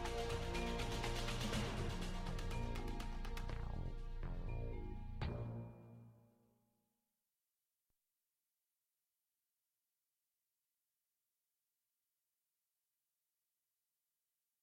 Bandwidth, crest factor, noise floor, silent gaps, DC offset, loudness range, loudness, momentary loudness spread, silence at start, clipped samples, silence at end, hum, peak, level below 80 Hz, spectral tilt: 15 kHz; 18 dB; under -90 dBFS; none; under 0.1%; 9 LU; -46 LUFS; 9 LU; 0 s; under 0.1%; 8.4 s; none; -30 dBFS; -50 dBFS; -5 dB/octave